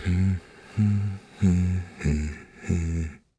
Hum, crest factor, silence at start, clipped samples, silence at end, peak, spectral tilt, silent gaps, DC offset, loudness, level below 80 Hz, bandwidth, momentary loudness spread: none; 16 dB; 0 s; under 0.1%; 0.2 s; -10 dBFS; -7.5 dB/octave; none; under 0.1%; -27 LUFS; -38 dBFS; 10 kHz; 10 LU